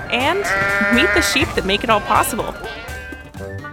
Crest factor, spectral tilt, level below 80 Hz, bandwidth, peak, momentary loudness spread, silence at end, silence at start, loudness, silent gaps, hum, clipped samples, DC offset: 18 dB; -3.5 dB/octave; -36 dBFS; 18 kHz; 0 dBFS; 17 LU; 0 s; 0 s; -16 LUFS; none; none; under 0.1%; under 0.1%